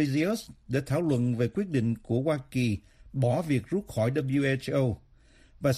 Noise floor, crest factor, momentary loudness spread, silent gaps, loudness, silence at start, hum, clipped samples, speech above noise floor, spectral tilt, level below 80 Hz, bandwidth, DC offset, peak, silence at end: -57 dBFS; 16 dB; 6 LU; none; -29 LUFS; 0 s; none; under 0.1%; 30 dB; -7 dB/octave; -56 dBFS; 14.5 kHz; under 0.1%; -12 dBFS; 0 s